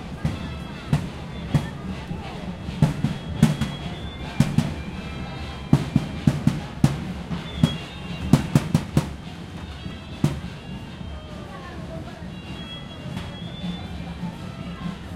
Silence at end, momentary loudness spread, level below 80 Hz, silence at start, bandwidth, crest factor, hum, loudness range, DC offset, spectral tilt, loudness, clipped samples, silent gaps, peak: 0 s; 14 LU; -40 dBFS; 0 s; 15.5 kHz; 24 dB; none; 10 LU; under 0.1%; -6.5 dB/octave; -27 LUFS; under 0.1%; none; -2 dBFS